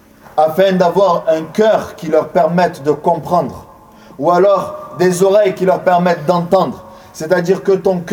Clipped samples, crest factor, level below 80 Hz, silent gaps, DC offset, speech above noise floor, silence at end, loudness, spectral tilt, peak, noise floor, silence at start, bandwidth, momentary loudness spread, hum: under 0.1%; 14 dB; -52 dBFS; none; under 0.1%; 27 dB; 0 s; -14 LUFS; -6 dB/octave; 0 dBFS; -40 dBFS; 0.35 s; 18 kHz; 7 LU; none